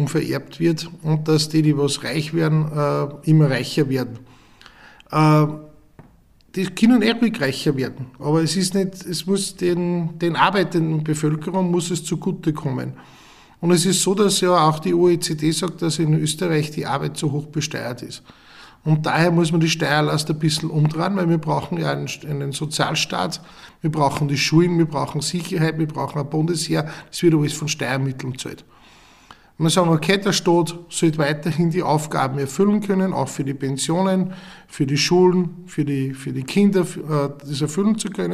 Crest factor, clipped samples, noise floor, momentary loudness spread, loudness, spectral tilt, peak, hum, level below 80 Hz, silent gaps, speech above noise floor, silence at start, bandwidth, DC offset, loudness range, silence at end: 20 dB; under 0.1%; -52 dBFS; 10 LU; -20 LUFS; -5.5 dB/octave; 0 dBFS; none; -56 dBFS; none; 33 dB; 0 s; 14.5 kHz; under 0.1%; 3 LU; 0 s